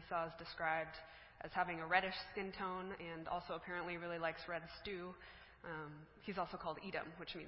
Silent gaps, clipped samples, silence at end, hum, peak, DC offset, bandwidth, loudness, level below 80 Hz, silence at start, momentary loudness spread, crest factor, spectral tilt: none; under 0.1%; 0 s; none; -20 dBFS; under 0.1%; 5.6 kHz; -44 LUFS; -68 dBFS; 0 s; 14 LU; 26 dB; -2.5 dB/octave